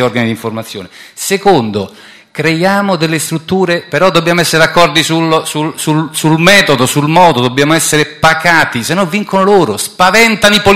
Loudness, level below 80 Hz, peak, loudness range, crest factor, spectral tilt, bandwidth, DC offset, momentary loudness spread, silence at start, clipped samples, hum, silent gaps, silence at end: -9 LUFS; -42 dBFS; 0 dBFS; 4 LU; 10 dB; -4 dB/octave; 17 kHz; under 0.1%; 11 LU; 0 s; 1%; none; none; 0 s